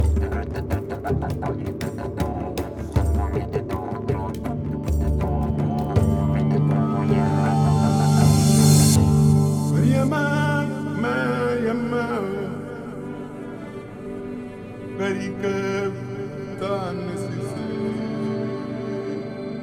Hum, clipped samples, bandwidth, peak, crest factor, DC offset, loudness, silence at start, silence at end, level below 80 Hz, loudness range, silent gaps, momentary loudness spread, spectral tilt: none; under 0.1%; 18.5 kHz; -4 dBFS; 18 dB; under 0.1%; -22 LUFS; 0 s; 0 s; -34 dBFS; 11 LU; none; 16 LU; -6.5 dB/octave